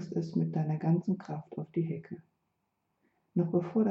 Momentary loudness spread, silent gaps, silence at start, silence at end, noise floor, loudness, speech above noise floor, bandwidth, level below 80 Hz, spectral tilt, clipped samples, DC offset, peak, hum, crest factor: 11 LU; none; 0 s; 0 s; -80 dBFS; -33 LUFS; 49 dB; 6.6 kHz; -76 dBFS; -10.5 dB/octave; under 0.1%; under 0.1%; -18 dBFS; none; 16 dB